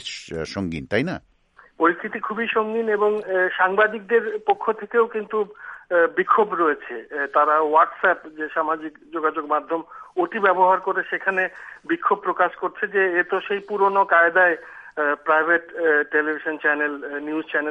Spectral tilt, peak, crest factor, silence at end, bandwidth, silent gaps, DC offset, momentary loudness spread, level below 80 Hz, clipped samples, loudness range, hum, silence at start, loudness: -5.5 dB/octave; -4 dBFS; 18 dB; 0 s; 9.4 kHz; none; under 0.1%; 11 LU; -60 dBFS; under 0.1%; 3 LU; none; 0 s; -21 LUFS